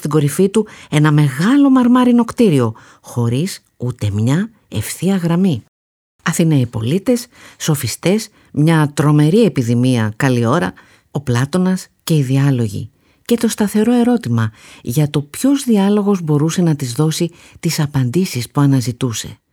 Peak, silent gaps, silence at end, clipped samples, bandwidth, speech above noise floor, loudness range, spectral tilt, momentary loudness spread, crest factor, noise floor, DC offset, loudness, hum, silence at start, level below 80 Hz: 0 dBFS; 5.68-6.19 s; 0.2 s; under 0.1%; 18 kHz; over 75 dB; 4 LU; -6.5 dB/octave; 11 LU; 14 dB; under -90 dBFS; under 0.1%; -16 LUFS; none; 0 s; -52 dBFS